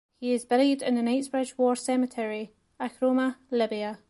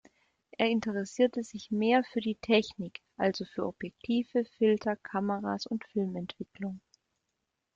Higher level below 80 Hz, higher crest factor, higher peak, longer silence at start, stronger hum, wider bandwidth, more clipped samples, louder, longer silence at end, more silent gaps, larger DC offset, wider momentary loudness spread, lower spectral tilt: about the same, -72 dBFS vs -70 dBFS; about the same, 16 dB vs 20 dB; about the same, -10 dBFS vs -12 dBFS; second, 0.2 s vs 0.6 s; neither; first, 11.5 kHz vs 7.8 kHz; neither; first, -27 LUFS vs -31 LUFS; second, 0.15 s vs 1 s; neither; neither; about the same, 11 LU vs 13 LU; second, -4 dB/octave vs -6 dB/octave